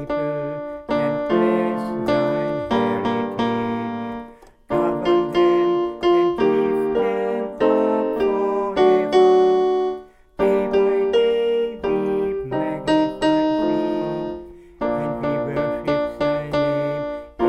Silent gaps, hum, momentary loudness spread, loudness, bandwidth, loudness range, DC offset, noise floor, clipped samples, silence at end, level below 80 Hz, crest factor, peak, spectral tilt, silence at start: none; none; 9 LU; -20 LUFS; 8.6 kHz; 4 LU; under 0.1%; -41 dBFS; under 0.1%; 0 s; -48 dBFS; 16 dB; -4 dBFS; -7 dB/octave; 0 s